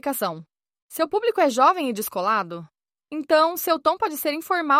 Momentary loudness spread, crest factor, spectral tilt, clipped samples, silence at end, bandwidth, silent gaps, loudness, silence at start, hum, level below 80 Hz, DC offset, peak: 15 LU; 18 dB; -3.5 dB/octave; under 0.1%; 0 s; 16.5 kHz; 0.82-0.89 s; -22 LUFS; 0.05 s; none; -70 dBFS; under 0.1%; -6 dBFS